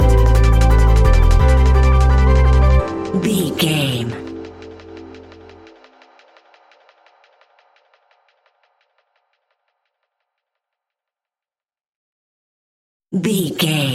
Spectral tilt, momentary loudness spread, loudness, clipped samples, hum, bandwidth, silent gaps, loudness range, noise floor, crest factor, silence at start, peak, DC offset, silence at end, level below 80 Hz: -6 dB/octave; 22 LU; -15 LUFS; under 0.1%; none; 14.5 kHz; 11.96-13.00 s; 19 LU; under -90 dBFS; 14 dB; 0 s; -2 dBFS; under 0.1%; 0 s; -18 dBFS